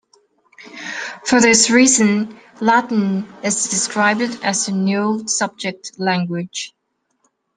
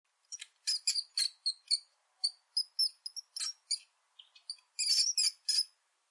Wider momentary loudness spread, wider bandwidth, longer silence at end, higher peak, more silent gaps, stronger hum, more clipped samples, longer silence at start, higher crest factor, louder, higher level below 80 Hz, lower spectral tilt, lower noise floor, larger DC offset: about the same, 16 LU vs 18 LU; about the same, 10.5 kHz vs 11.5 kHz; first, 0.9 s vs 0.45 s; first, 0 dBFS vs -16 dBFS; neither; neither; neither; first, 0.6 s vs 0.3 s; about the same, 18 dB vs 20 dB; first, -17 LUFS vs -32 LUFS; first, -62 dBFS vs under -90 dBFS; first, -3 dB/octave vs 10.5 dB/octave; first, -67 dBFS vs -63 dBFS; neither